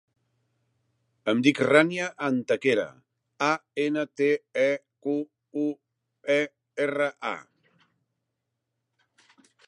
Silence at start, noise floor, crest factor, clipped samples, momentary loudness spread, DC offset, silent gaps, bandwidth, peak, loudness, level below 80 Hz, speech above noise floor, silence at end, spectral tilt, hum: 1.25 s; -82 dBFS; 24 dB; under 0.1%; 13 LU; under 0.1%; none; 11.5 kHz; -4 dBFS; -26 LUFS; -80 dBFS; 57 dB; 2.25 s; -5 dB/octave; none